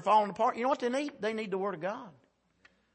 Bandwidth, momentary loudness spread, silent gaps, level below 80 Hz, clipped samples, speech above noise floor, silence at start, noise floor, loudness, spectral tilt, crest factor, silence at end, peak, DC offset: 8.8 kHz; 11 LU; none; -78 dBFS; under 0.1%; 36 dB; 0 s; -67 dBFS; -32 LUFS; -5 dB/octave; 18 dB; 0.85 s; -14 dBFS; under 0.1%